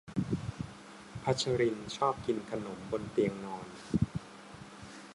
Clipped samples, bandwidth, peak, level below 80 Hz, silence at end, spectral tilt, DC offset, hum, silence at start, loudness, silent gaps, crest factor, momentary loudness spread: under 0.1%; 11.5 kHz; -16 dBFS; -56 dBFS; 0 s; -6 dB/octave; under 0.1%; none; 0.05 s; -35 LUFS; none; 20 dB; 17 LU